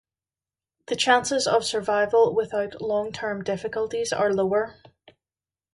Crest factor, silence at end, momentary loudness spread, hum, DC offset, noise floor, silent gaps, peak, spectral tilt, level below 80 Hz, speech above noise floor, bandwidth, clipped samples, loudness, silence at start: 18 dB; 1.05 s; 9 LU; none; under 0.1%; under -90 dBFS; none; -8 dBFS; -3 dB/octave; -62 dBFS; over 66 dB; 11.5 kHz; under 0.1%; -24 LUFS; 0.9 s